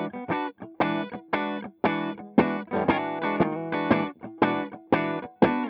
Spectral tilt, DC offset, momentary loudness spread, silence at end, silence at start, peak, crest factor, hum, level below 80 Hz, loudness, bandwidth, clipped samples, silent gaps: -9.5 dB/octave; under 0.1%; 7 LU; 0 s; 0 s; -4 dBFS; 22 dB; none; -60 dBFS; -27 LUFS; 5.6 kHz; under 0.1%; none